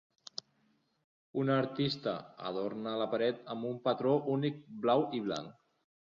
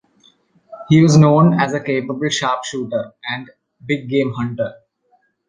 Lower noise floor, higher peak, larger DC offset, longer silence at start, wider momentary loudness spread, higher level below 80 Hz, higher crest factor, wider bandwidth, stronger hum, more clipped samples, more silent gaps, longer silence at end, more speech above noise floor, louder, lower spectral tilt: first, -74 dBFS vs -61 dBFS; second, -16 dBFS vs -2 dBFS; neither; first, 1.35 s vs 0.7 s; second, 12 LU vs 16 LU; second, -76 dBFS vs -54 dBFS; about the same, 18 dB vs 16 dB; second, 7.4 kHz vs 9.6 kHz; neither; neither; neither; second, 0.5 s vs 0.75 s; second, 41 dB vs 45 dB; second, -34 LUFS vs -17 LUFS; about the same, -7 dB/octave vs -6 dB/octave